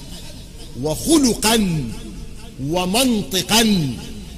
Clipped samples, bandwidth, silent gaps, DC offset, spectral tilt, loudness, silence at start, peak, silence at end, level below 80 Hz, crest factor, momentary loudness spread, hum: under 0.1%; 15.5 kHz; none; under 0.1%; -3.5 dB/octave; -18 LUFS; 0 s; -2 dBFS; 0 s; -36 dBFS; 18 dB; 21 LU; none